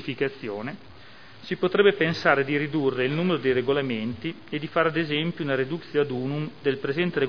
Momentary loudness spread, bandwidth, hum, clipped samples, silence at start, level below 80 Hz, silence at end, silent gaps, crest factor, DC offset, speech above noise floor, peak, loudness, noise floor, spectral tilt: 12 LU; 5.4 kHz; none; under 0.1%; 0 s; -62 dBFS; 0 s; none; 20 dB; 0.4%; 23 dB; -4 dBFS; -25 LUFS; -48 dBFS; -7.5 dB/octave